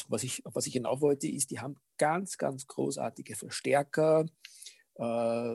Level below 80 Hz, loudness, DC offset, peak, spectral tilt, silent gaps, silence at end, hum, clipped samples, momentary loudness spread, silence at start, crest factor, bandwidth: -80 dBFS; -32 LUFS; under 0.1%; -14 dBFS; -4.5 dB/octave; none; 0 s; none; under 0.1%; 14 LU; 0 s; 18 dB; 13.5 kHz